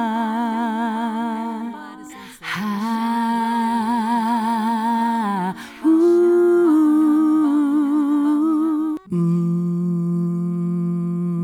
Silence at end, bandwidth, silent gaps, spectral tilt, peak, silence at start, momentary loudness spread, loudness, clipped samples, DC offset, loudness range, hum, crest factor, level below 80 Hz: 0 s; 18 kHz; none; -7.5 dB/octave; -8 dBFS; 0 s; 11 LU; -19 LUFS; under 0.1%; under 0.1%; 7 LU; none; 12 dB; -66 dBFS